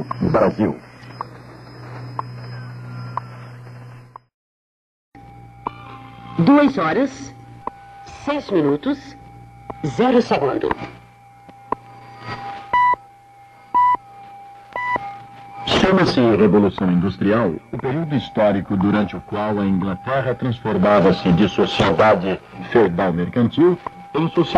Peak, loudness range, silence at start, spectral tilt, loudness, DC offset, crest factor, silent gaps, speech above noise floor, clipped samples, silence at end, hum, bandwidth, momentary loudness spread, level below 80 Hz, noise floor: -2 dBFS; 17 LU; 0 s; -7 dB/octave; -18 LUFS; under 0.1%; 18 dB; 4.34-5.12 s; 29 dB; under 0.1%; 0 s; none; 10 kHz; 23 LU; -48 dBFS; -46 dBFS